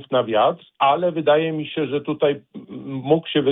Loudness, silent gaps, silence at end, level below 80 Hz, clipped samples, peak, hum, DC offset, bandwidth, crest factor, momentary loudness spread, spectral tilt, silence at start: -20 LUFS; none; 0 s; -66 dBFS; under 0.1%; -6 dBFS; none; under 0.1%; 4 kHz; 16 dB; 13 LU; -9.5 dB/octave; 0 s